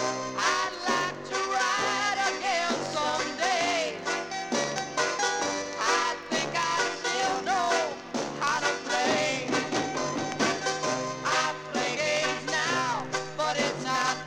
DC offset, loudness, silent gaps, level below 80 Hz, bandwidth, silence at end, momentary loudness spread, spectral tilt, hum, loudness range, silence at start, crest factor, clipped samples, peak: under 0.1%; -27 LUFS; none; -66 dBFS; 19.5 kHz; 0 s; 5 LU; -2 dB/octave; none; 1 LU; 0 s; 20 dB; under 0.1%; -8 dBFS